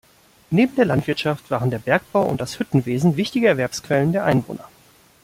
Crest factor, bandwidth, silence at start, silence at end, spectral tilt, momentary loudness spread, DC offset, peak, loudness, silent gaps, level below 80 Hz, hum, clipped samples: 18 dB; 16 kHz; 0.5 s; 0.55 s; -6.5 dB/octave; 5 LU; under 0.1%; -4 dBFS; -20 LUFS; none; -54 dBFS; none; under 0.1%